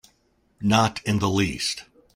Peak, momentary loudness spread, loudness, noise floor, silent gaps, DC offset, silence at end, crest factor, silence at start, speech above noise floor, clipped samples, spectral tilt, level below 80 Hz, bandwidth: -4 dBFS; 8 LU; -23 LUFS; -65 dBFS; none; under 0.1%; 0.35 s; 20 dB; 0.6 s; 43 dB; under 0.1%; -4.5 dB/octave; -52 dBFS; 15.5 kHz